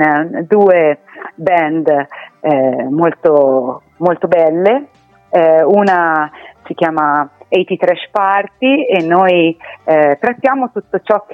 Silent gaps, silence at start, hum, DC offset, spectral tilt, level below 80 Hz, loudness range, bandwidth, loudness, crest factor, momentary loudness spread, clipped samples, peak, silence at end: none; 0 s; none; under 0.1%; -8 dB/octave; -62 dBFS; 2 LU; 6.4 kHz; -13 LUFS; 12 dB; 9 LU; under 0.1%; 0 dBFS; 0 s